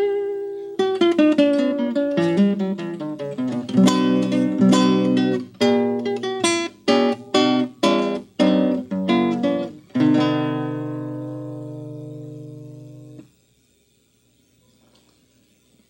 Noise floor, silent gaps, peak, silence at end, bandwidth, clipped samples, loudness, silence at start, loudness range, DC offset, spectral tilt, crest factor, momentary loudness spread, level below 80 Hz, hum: -61 dBFS; none; -4 dBFS; 2.65 s; 12 kHz; under 0.1%; -20 LUFS; 0 s; 15 LU; under 0.1%; -5.5 dB/octave; 18 dB; 17 LU; -70 dBFS; none